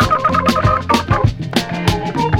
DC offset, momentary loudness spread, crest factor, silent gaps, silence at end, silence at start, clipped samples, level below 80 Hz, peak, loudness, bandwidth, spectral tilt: under 0.1%; 5 LU; 14 dB; none; 0 s; 0 s; under 0.1%; -30 dBFS; 0 dBFS; -16 LUFS; 17 kHz; -6 dB/octave